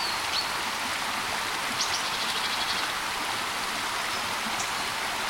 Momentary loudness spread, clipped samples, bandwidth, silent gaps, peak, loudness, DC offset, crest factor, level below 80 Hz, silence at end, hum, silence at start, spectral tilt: 2 LU; under 0.1%; 16.5 kHz; none; -14 dBFS; -27 LUFS; under 0.1%; 16 dB; -58 dBFS; 0 s; none; 0 s; -0.5 dB/octave